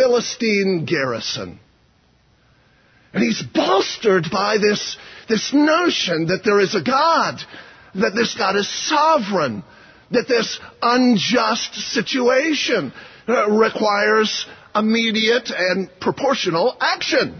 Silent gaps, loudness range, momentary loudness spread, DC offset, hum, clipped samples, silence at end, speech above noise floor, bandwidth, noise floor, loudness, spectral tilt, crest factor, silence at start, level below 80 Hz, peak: none; 4 LU; 8 LU; under 0.1%; none; under 0.1%; 0 s; 39 dB; 6.6 kHz; -57 dBFS; -18 LUFS; -4 dB/octave; 14 dB; 0 s; -60 dBFS; -4 dBFS